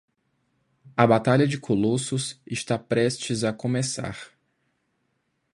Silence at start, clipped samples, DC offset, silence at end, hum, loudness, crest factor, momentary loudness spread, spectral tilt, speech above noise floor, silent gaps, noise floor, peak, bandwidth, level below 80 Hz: 0.85 s; under 0.1%; under 0.1%; 1.3 s; none; -24 LUFS; 24 dB; 12 LU; -5.5 dB/octave; 50 dB; none; -74 dBFS; -2 dBFS; 11.5 kHz; -60 dBFS